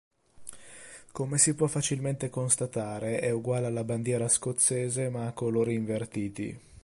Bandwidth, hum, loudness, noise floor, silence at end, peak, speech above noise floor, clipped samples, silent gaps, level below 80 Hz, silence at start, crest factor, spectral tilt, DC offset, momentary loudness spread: 11.5 kHz; none; -28 LUFS; -49 dBFS; 0.05 s; -10 dBFS; 20 dB; under 0.1%; none; -62 dBFS; 0.4 s; 20 dB; -4.5 dB/octave; under 0.1%; 21 LU